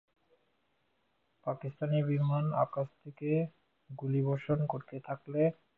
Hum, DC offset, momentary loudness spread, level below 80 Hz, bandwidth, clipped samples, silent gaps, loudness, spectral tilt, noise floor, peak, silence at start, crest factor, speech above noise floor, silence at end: none; under 0.1%; 11 LU; -68 dBFS; 4.1 kHz; under 0.1%; none; -34 LUFS; -11.5 dB/octave; -77 dBFS; -16 dBFS; 1.45 s; 18 dB; 44 dB; 0.25 s